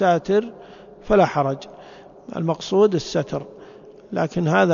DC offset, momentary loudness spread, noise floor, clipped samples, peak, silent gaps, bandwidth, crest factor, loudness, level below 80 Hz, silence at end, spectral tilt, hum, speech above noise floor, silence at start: under 0.1%; 22 LU; -43 dBFS; under 0.1%; -4 dBFS; none; 7.4 kHz; 18 dB; -21 LUFS; -48 dBFS; 0 s; -6.5 dB/octave; none; 24 dB; 0 s